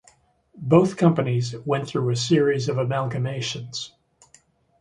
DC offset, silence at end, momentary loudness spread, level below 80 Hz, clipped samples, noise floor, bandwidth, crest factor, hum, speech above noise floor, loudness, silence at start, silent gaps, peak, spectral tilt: under 0.1%; 0.95 s; 13 LU; -60 dBFS; under 0.1%; -59 dBFS; 11 kHz; 20 dB; none; 37 dB; -23 LUFS; 0.55 s; none; -2 dBFS; -6 dB/octave